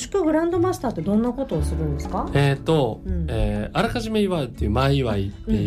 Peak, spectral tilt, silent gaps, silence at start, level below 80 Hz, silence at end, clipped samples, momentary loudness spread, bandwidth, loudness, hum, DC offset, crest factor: -8 dBFS; -7 dB/octave; none; 0 s; -32 dBFS; 0 s; under 0.1%; 6 LU; 14.5 kHz; -23 LUFS; none; under 0.1%; 12 dB